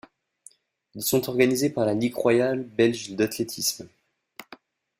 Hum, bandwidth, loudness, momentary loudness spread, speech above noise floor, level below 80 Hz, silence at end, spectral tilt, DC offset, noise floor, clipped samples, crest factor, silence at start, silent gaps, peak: none; 16 kHz; -24 LUFS; 14 LU; 31 dB; -64 dBFS; 0.55 s; -4.5 dB/octave; under 0.1%; -55 dBFS; under 0.1%; 20 dB; 0.95 s; none; -6 dBFS